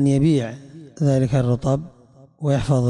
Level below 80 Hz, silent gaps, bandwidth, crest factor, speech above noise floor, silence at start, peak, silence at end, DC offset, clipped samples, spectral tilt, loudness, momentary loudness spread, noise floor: -44 dBFS; none; 10.5 kHz; 12 dB; 30 dB; 0 s; -8 dBFS; 0 s; under 0.1%; under 0.1%; -8 dB/octave; -21 LUFS; 19 LU; -49 dBFS